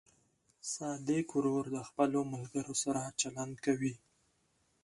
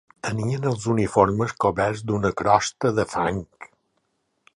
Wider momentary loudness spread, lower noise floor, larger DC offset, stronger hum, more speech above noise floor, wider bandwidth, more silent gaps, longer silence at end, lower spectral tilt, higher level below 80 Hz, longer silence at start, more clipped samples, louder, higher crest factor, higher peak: about the same, 7 LU vs 7 LU; about the same, -75 dBFS vs -72 dBFS; neither; neither; second, 40 dB vs 50 dB; about the same, 11.5 kHz vs 11.5 kHz; neither; about the same, 0.9 s vs 0.9 s; second, -4.5 dB/octave vs -6 dB/octave; second, -72 dBFS vs -48 dBFS; first, 0.65 s vs 0.25 s; neither; second, -36 LUFS vs -23 LUFS; about the same, 20 dB vs 22 dB; second, -16 dBFS vs -2 dBFS